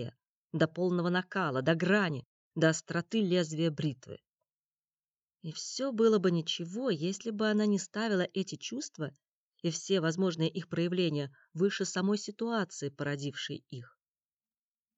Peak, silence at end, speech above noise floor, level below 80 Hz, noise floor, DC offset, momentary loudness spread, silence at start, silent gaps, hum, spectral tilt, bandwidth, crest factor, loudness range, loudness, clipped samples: -14 dBFS; 1.1 s; over 58 dB; -80 dBFS; under -90 dBFS; under 0.1%; 13 LU; 0 s; 0.27-0.48 s, 2.25-2.51 s, 4.57-4.71 s, 5.15-5.20 s, 9.31-9.52 s; none; -5 dB/octave; 8.2 kHz; 20 dB; 4 LU; -32 LUFS; under 0.1%